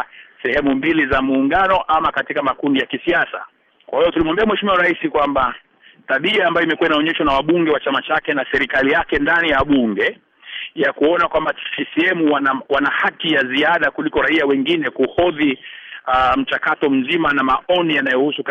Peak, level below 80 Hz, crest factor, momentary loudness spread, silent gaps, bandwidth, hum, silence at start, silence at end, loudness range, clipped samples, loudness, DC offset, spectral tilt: -6 dBFS; -44 dBFS; 12 dB; 5 LU; none; 7.2 kHz; none; 0 s; 0 s; 2 LU; under 0.1%; -17 LUFS; under 0.1%; -6.5 dB/octave